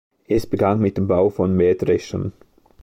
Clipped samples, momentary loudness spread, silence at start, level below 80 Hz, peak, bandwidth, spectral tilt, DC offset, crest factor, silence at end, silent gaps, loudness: under 0.1%; 9 LU; 0.3 s; -44 dBFS; -4 dBFS; 16 kHz; -8 dB/octave; under 0.1%; 14 dB; 0.5 s; none; -20 LUFS